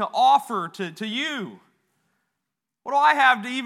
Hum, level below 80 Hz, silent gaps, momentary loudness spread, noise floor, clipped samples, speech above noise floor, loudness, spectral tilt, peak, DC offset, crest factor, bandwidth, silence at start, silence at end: none; -90 dBFS; none; 16 LU; -83 dBFS; under 0.1%; 61 dB; -21 LUFS; -3.5 dB/octave; -4 dBFS; under 0.1%; 20 dB; 15 kHz; 0 s; 0 s